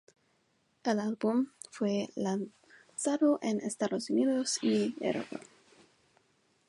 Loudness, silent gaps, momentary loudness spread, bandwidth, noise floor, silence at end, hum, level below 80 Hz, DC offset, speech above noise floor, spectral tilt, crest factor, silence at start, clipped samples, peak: -32 LUFS; none; 10 LU; 11.5 kHz; -73 dBFS; 1.25 s; none; -80 dBFS; under 0.1%; 42 dB; -4.5 dB/octave; 16 dB; 0.85 s; under 0.1%; -16 dBFS